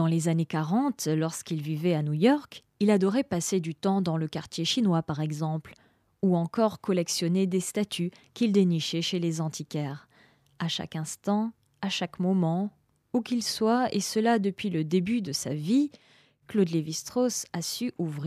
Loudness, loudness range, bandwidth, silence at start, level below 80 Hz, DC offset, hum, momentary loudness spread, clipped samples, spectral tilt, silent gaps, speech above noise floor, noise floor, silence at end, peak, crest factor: -28 LUFS; 4 LU; 15.5 kHz; 0 s; -68 dBFS; under 0.1%; none; 9 LU; under 0.1%; -5.5 dB/octave; none; 34 dB; -61 dBFS; 0 s; -10 dBFS; 18 dB